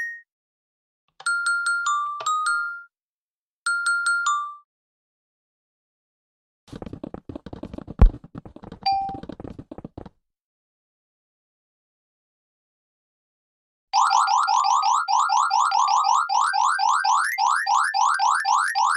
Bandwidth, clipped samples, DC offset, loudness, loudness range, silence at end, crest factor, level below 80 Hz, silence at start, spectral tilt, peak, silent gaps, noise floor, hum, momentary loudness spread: 13.5 kHz; under 0.1%; under 0.1%; -21 LUFS; 13 LU; 0 s; 22 dB; -34 dBFS; 0 s; -2.5 dB/octave; -2 dBFS; 0.32-1.08 s, 3.02-3.66 s, 4.64-6.67 s, 10.41-13.87 s; under -90 dBFS; none; 20 LU